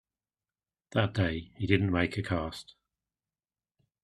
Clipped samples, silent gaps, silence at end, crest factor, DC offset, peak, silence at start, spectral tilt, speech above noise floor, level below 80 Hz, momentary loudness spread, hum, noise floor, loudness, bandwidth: under 0.1%; none; 1.4 s; 24 dB; under 0.1%; -8 dBFS; 0.95 s; -7 dB/octave; over 60 dB; -56 dBFS; 9 LU; none; under -90 dBFS; -30 LUFS; 11.5 kHz